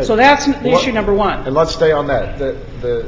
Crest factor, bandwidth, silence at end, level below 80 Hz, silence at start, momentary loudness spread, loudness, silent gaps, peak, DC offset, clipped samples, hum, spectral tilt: 14 dB; 7.8 kHz; 0 s; -30 dBFS; 0 s; 12 LU; -15 LUFS; none; 0 dBFS; under 0.1%; under 0.1%; none; -5 dB/octave